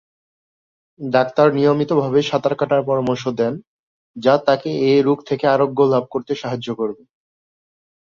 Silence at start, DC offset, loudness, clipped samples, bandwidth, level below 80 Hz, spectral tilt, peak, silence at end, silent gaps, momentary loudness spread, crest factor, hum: 1 s; under 0.1%; -18 LUFS; under 0.1%; 7.2 kHz; -60 dBFS; -7 dB/octave; -2 dBFS; 1.05 s; 3.67-4.14 s; 9 LU; 18 dB; none